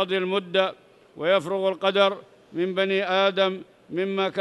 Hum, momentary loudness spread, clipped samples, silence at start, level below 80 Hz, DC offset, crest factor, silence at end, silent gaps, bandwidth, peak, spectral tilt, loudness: none; 9 LU; under 0.1%; 0 s; -76 dBFS; under 0.1%; 16 dB; 0 s; none; 11 kHz; -8 dBFS; -5.5 dB/octave; -24 LUFS